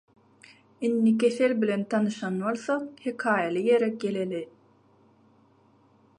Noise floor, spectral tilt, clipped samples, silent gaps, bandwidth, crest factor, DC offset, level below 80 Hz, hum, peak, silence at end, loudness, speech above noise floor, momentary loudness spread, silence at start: -61 dBFS; -6.5 dB/octave; under 0.1%; none; 10.5 kHz; 18 dB; under 0.1%; -78 dBFS; none; -10 dBFS; 1.75 s; -26 LUFS; 35 dB; 9 LU; 0.8 s